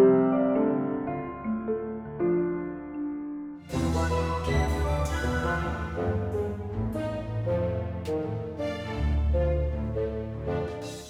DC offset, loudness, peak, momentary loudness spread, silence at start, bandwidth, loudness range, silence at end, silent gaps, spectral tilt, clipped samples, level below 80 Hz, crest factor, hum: under 0.1%; -29 LUFS; -10 dBFS; 8 LU; 0 s; 13.5 kHz; 2 LU; 0 s; none; -7.5 dB/octave; under 0.1%; -36 dBFS; 18 dB; none